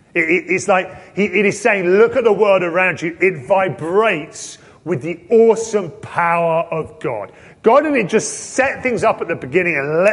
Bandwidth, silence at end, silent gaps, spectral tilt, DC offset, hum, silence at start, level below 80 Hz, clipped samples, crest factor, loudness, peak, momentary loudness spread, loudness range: 11.5 kHz; 0 s; none; -5 dB/octave; under 0.1%; none; 0.15 s; -54 dBFS; under 0.1%; 16 dB; -16 LUFS; -2 dBFS; 11 LU; 3 LU